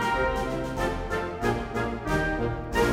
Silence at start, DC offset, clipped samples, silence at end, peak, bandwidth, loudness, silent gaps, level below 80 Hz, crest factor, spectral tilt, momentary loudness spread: 0 s; under 0.1%; under 0.1%; 0 s; -10 dBFS; 16 kHz; -28 LUFS; none; -36 dBFS; 18 dB; -5.5 dB/octave; 4 LU